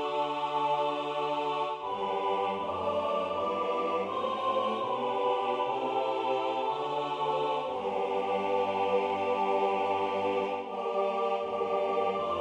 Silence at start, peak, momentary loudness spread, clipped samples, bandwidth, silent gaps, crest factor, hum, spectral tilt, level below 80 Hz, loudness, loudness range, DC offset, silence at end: 0 s; -16 dBFS; 3 LU; under 0.1%; 10 kHz; none; 14 dB; none; -5.5 dB/octave; -72 dBFS; -30 LUFS; 1 LU; under 0.1%; 0 s